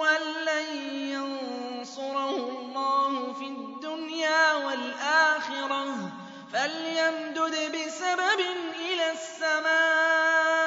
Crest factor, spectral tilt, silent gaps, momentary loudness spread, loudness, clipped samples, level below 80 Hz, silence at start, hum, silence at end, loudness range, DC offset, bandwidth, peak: 18 dB; -2 dB/octave; none; 13 LU; -27 LUFS; under 0.1%; -86 dBFS; 0 s; none; 0 s; 5 LU; under 0.1%; 8 kHz; -10 dBFS